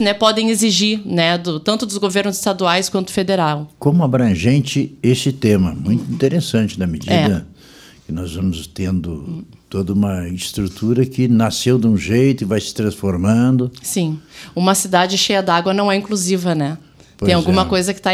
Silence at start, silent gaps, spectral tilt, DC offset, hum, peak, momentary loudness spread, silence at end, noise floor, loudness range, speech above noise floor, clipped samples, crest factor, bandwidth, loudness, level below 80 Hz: 0 s; none; -5 dB/octave; under 0.1%; none; 0 dBFS; 9 LU; 0 s; -43 dBFS; 5 LU; 27 dB; under 0.1%; 16 dB; 16 kHz; -17 LUFS; -44 dBFS